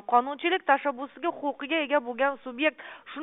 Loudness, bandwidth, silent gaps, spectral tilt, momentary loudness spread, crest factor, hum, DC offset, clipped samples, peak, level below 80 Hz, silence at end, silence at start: -27 LUFS; 3.9 kHz; none; 4.5 dB/octave; 8 LU; 20 dB; none; under 0.1%; under 0.1%; -8 dBFS; -76 dBFS; 0 s; 0.1 s